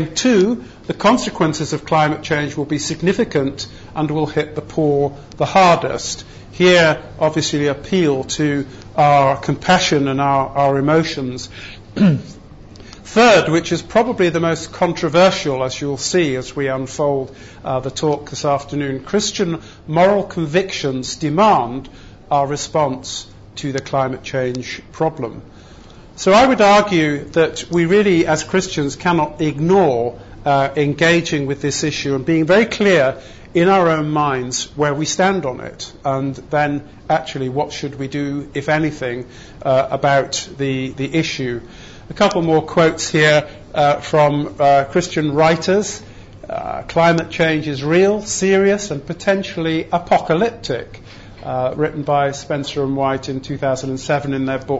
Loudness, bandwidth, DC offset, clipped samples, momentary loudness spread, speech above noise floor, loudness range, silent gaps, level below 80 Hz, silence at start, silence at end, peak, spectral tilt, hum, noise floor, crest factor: -17 LUFS; 8 kHz; under 0.1%; under 0.1%; 12 LU; 23 dB; 5 LU; none; -44 dBFS; 0 s; 0 s; -2 dBFS; -5 dB/octave; none; -40 dBFS; 14 dB